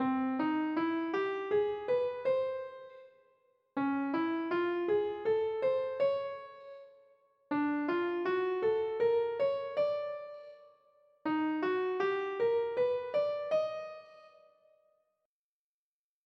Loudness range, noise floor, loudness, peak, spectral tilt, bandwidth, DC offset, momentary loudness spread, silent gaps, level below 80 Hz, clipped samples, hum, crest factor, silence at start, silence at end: 2 LU; under -90 dBFS; -33 LUFS; -20 dBFS; -7 dB/octave; 6.2 kHz; under 0.1%; 14 LU; none; -80 dBFS; under 0.1%; none; 14 dB; 0 s; 2 s